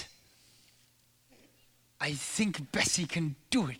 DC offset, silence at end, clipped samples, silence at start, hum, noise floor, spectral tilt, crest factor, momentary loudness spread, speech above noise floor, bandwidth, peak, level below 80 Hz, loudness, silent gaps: under 0.1%; 0 s; under 0.1%; 0 s; none; -67 dBFS; -3.5 dB/octave; 22 dB; 7 LU; 35 dB; over 20 kHz; -14 dBFS; -64 dBFS; -31 LUFS; none